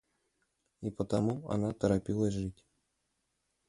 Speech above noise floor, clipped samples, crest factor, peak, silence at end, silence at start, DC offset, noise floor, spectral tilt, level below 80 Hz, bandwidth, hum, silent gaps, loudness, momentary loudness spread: 48 dB; under 0.1%; 20 dB; -16 dBFS; 1.15 s; 0.8 s; under 0.1%; -81 dBFS; -7.5 dB/octave; -56 dBFS; 11.5 kHz; none; none; -34 LUFS; 11 LU